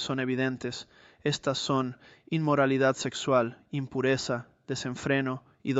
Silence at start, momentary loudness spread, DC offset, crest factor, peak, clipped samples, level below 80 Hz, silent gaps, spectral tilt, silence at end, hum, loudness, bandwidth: 0 s; 11 LU; under 0.1%; 18 dB; -10 dBFS; under 0.1%; -66 dBFS; none; -5 dB/octave; 0 s; none; -29 LUFS; 8.2 kHz